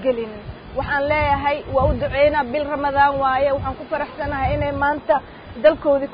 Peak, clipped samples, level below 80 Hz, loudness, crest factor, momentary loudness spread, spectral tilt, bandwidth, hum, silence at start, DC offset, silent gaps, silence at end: -4 dBFS; under 0.1%; -34 dBFS; -20 LUFS; 16 dB; 9 LU; -11 dB/octave; 5.2 kHz; none; 0 s; under 0.1%; none; 0 s